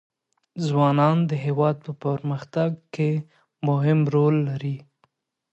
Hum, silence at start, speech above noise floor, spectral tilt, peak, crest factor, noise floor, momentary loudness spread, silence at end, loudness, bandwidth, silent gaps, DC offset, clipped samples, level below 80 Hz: none; 0.55 s; 46 dB; -9 dB/octave; -8 dBFS; 16 dB; -68 dBFS; 10 LU; 0.7 s; -23 LUFS; 8 kHz; none; under 0.1%; under 0.1%; -68 dBFS